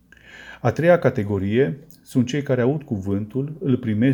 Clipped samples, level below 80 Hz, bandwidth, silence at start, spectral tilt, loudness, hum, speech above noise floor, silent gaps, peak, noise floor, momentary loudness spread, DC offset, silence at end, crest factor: under 0.1%; -56 dBFS; 20 kHz; 0.3 s; -8 dB/octave; -22 LUFS; none; 24 dB; none; -4 dBFS; -44 dBFS; 10 LU; under 0.1%; 0 s; 18 dB